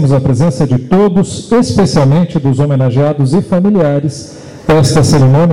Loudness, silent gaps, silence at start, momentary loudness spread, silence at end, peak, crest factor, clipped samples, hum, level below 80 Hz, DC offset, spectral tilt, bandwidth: -10 LUFS; none; 0 s; 6 LU; 0 s; -4 dBFS; 6 dB; under 0.1%; none; -34 dBFS; 1%; -7 dB/octave; 12 kHz